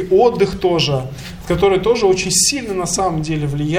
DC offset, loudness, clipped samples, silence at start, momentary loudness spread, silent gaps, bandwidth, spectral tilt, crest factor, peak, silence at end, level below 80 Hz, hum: under 0.1%; -16 LUFS; under 0.1%; 0 s; 8 LU; none; 16 kHz; -4 dB/octave; 14 dB; -2 dBFS; 0 s; -36 dBFS; none